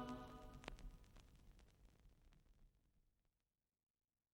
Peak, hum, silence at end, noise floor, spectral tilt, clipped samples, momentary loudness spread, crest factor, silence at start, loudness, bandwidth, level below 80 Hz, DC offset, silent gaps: -28 dBFS; none; 1.25 s; under -90 dBFS; -5.5 dB/octave; under 0.1%; 14 LU; 32 dB; 0 s; -59 LUFS; 16 kHz; -66 dBFS; under 0.1%; none